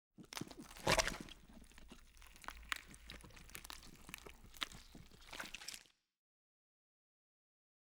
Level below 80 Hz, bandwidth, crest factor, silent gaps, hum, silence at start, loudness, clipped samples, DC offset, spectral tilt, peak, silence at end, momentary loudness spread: -60 dBFS; over 20 kHz; 32 dB; none; none; 0.2 s; -45 LUFS; under 0.1%; under 0.1%; -2.5 dB/octave; -18 dBFS; 2.15 s; 24 LU